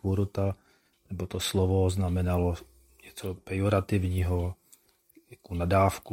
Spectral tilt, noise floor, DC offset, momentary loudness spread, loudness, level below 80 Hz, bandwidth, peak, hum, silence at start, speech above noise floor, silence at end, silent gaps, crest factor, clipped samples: -6.5 dB/octave; -62 dBFS; under 0.1%; 14 LU; -29 LUFS; -52 dBFS; 16.5 kHz; -10 dBFS; none; 0.05 s; 35 dB; 0 s; none; 20 dB; under 0.1%